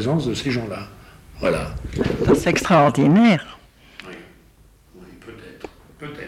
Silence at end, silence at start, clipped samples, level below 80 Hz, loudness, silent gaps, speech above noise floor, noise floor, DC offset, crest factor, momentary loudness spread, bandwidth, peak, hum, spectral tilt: 0 s; 0 s; under 0.1%; -40 dBFS; -19 LUFS; none; 34 dB; -52 dBFS; under 0.1%; 16 dB; 26 LU; 14.5 kHz; -4 dBFS; none; -6.5 dB/octave